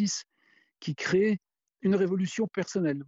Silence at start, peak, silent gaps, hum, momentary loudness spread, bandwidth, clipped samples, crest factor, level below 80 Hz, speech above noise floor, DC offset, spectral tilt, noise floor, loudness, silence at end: 0 s; -14 dBFS; none; none; 9 LU; 8 kHz; under 0.1%; 14 dB; -70 dBFS; 39 dB; under 0.1%; -5.5 dB/octave; -67 dBFS; -29 LUFS; 0.05 s